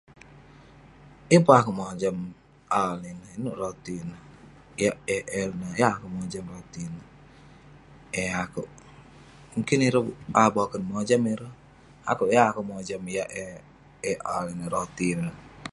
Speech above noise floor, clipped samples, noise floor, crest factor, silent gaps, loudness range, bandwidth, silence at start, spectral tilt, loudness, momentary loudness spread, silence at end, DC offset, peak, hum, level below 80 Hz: 25 dB; under 0.1%; -51 dBFS; 26 dB; none; 7 LU; 11.5 kHz; 0.3 s; -5.5 dB/octave; -26 LUFS; 17 LU; 0 s; under 0.1%; -2 dBFS; none; -58 dBFS